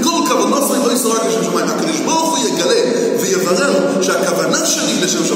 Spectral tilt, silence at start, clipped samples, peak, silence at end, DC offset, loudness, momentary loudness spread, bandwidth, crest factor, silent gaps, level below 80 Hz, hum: -3 dB/octave; 0 s; under 0.1%; -2 dBFS; 0 s; under 0.1%; -14 LUFS; 2 LU; 16.5 kHz; 14 dB; none; -68 dBFS; none